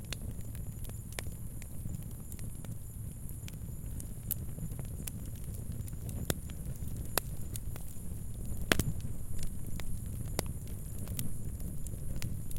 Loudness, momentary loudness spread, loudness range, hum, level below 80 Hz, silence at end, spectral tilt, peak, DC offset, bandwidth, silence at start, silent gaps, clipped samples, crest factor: -40 LUFS; 8 LU; 6 LU; none; -44 dBFS; 0 s; -4.5 dB/octave; -4 dBFS; under 0.1%; 17 kHz; 0 s; none; under 0.1%; 34 dB